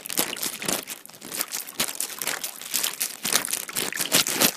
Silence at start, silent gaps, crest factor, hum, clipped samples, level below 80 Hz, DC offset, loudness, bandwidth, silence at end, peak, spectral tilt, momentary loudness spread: 0 s; none; 28 dB; none; under 0.1%; -68 dBFS; under 0.1%; -25 LUFS; 16 kHz; 0 s; 0 dBFS; -0.5 dB/octave; 9 LU